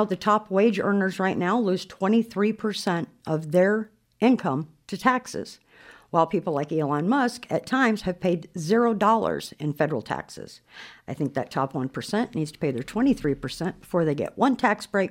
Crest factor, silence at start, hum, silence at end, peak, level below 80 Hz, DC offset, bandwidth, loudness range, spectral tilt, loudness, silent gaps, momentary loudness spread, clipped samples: 18 dB; 0 s; none; 0 s; -6 dBFS; -58 dBFS; under 0.1%; 16 kHz; 4 LU; -6 dB/octave; -25 LUFS; none; 10 LU; under 0.1%